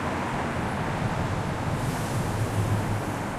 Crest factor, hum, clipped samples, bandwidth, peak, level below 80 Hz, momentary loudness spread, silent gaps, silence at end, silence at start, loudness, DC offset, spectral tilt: 14 dB; none; under 0.1%; 15 kHz; -14 dBFS; -42 dBFS; 2 LU; none; 0 s; 0 s; -28 LUFS; under 0.1%; -6 dB/octave